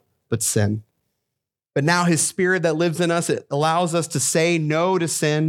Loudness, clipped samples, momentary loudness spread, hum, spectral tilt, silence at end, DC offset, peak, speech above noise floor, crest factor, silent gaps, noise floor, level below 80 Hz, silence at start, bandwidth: -20 LUFS; under 0.1%; 5 LU; none; -4.5 dB/octave; 0 s; under 0.1%; -4 dBFS; 63 dB; 16 dB; none; -83 dBFS; -64 dBFS; 0.3 s; 17 kHz